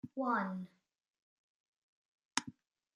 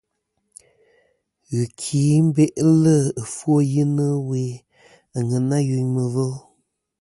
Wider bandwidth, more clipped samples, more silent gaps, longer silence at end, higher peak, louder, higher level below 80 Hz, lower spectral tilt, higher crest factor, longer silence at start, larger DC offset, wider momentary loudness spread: about the same, 11.5 kHz vs 11.5 kHz; neither; first, 1.10-1.14 s, 1.22-2.18 s, 2.25-2.29 s vs none; second, 0.45 s vs 0.6 s; second, -12 dBFS vs -6 dBFS; second, -39 LUFS vs -20 LUFS; second, -86 dBFS vs -60 dBFS; second, -3.5 dB/octave vs -7.5 dB/octave; first, 30 dB vs 16 dB; second, 0.05 s vs 1.5 s; neither; first, 18 LU vs 11 LU